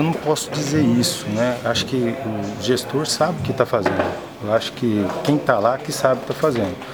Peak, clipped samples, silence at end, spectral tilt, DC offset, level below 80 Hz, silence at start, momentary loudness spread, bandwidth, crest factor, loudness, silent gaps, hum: 0 dBFS; under 0.1%; 0 s; -5 dB/octave; under 0.1%; -54 dBFS; 0 s; 5 LU; over 20 kHz; 20 dB; -20 LUFS; none; none